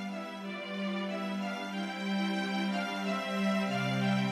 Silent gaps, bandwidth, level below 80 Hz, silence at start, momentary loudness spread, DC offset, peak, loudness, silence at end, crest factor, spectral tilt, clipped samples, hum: none; 14 kHz; -76 dBFS; 0 s; 8 LU; under 0.1%; -20 dBFS; -33 LUFS; 0 s; 14 dB; -6 dB/octave; under 0.1%; none